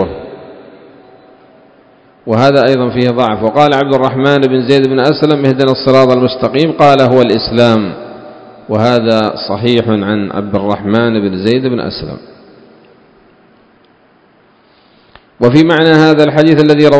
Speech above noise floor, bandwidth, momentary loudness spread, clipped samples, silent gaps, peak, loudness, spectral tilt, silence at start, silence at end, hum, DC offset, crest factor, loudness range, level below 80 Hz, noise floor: 38 dB; 8 kHz; 11 LU; 1%; none; 0 dBFS; -10 LUFS; -7 dB/octave; 0 s; 0 s; none; under 0.1%; 12 dB; 8 LU; -44 dBFS; -47 dBFS